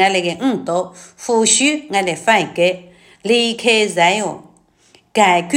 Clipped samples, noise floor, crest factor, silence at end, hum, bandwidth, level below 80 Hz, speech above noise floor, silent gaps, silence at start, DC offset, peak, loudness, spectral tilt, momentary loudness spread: under 0.1%; -53 dBFS; 16 dB; 0 s; none; 16.5 kHz; -64 dBFS; 37 dB; none; 0 s; under 0.1%; 0 dBFS; -15 LUFS; -2.5 dB/octave; 14 LU